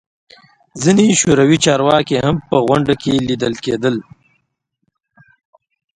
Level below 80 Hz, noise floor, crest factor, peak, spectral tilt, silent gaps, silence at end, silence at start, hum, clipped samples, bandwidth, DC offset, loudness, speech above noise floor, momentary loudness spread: -46 dBFS; -70 dBFS; 16 dB; 0 dBFS; -4.5 dB/octave; none; 1.95 s; 0.75 s; none; under 0.1%; 11 kHz; under 0.1%; -14 LUFS; 56 dB; 8 LU